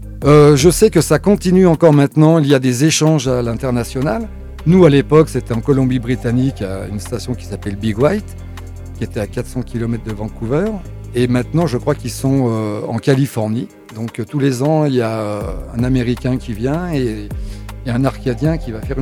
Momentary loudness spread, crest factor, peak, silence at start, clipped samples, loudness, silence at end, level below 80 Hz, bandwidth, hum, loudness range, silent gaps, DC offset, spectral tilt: 15 LU; 14 dB; 0 dBFS; 0 s; under 0.1%; -15 LUFS; 0 s; -32 dBFS; 15.5 kHz; none; 9 LU; none; under 0.1%; -6.5 dB/octave